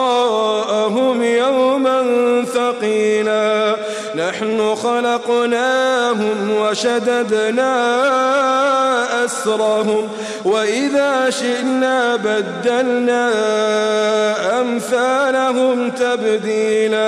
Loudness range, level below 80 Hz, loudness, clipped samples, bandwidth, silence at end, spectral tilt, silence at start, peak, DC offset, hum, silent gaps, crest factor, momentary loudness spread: 1 LU; -66 dBFS; -16 LUFS; under 0.1%; 13 kHz; 0 s; -3.5 dB/octave; 0 s; -6 dBFS; under 0.1%; none; none; 10 dB; 4 LU